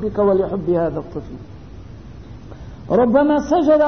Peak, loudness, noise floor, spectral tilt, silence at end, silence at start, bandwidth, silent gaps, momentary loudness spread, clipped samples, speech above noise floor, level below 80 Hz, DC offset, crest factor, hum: -2 dBFS; -17 LUFS; -37 dBFS; -8 dB/octave; 0 s; 0 s; 6.6 kHz; none; 24 LU; under 0.1%; 20 dB; -40 dBFS; 0.6%; 16 dB; none